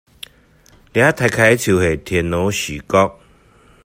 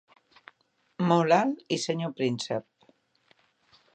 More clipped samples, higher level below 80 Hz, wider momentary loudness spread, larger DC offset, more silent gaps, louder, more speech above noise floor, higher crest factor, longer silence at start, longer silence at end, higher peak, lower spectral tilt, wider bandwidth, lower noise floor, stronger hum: neither; first, -44 dBFS vs -78 dBFS; first, 14 LU vs 10 LU; neither; neither; first, -16 LUFS vs -27 LUFS; second, 35 dB vs 42 dB; about the same, 18 dB vs 22 dB; about the same, 0.95 s vs 1 s; second, 0.7 s vs 1.35 s; first, 0 dBFS vs -8 dBFS; about the same, -5 dB/octave vs -5.5 dB/octave; first, 16 kHz vs 9.4 kHz; second, -50 dBFS vs -69 dBFS; neither